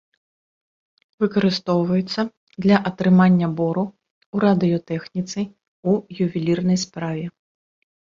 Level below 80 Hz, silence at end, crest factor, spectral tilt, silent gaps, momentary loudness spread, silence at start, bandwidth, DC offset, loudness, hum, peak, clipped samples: -58 dBFS; 0.8 s; 18 dB; -7 dB/octave; 2.37-2.47 s, 4.11-4.33 s, 5.68-5.83 s; 12 LU; 1.2 s; 7.4 kHz; under 0.1%; -21 LUFS; none; -2 dBFS; under 0.1%